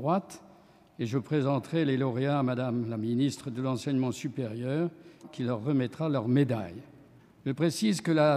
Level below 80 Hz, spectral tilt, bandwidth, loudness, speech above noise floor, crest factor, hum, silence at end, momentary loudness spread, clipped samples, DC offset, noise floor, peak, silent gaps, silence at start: -72 dBFS; -7 dB/octave; 14.5 kHz; -30 LUFS; 29 dB; 18 dB; none; 0 s; 10 LU; under 0.1%; under 0.1%; -57 dBFS; -12 dBFS; none; 0 s